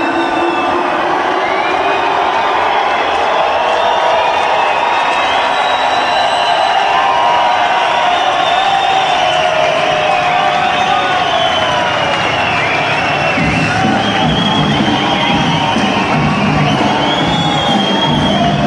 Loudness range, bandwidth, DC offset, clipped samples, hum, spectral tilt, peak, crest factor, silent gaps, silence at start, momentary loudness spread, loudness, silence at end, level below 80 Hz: 1 LU; 11 kHz; under 0.1%; under 0.1%; none; -4.5 dB/octave; -2 dBFS; 10 dB; none; 0 s; 2 LU; -12 LUFS; 0 s; -38 dBFS